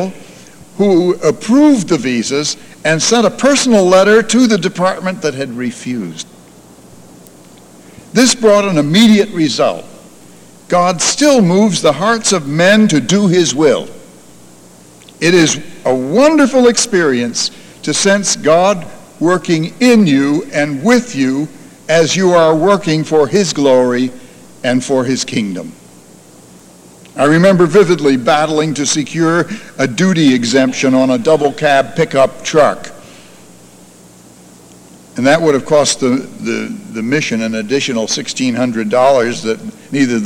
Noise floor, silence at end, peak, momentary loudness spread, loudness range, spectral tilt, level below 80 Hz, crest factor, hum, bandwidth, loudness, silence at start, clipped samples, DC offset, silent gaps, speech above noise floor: -40 dBFS; 0 s; 0 dBFS; 11 LU; 5 LU; -4.5 dB/octave; -52 dBFS; 12 dB; none; 16 kHz; -12 LUFS; 0 s; under 0.1%; under 0.1%; none; 29 dB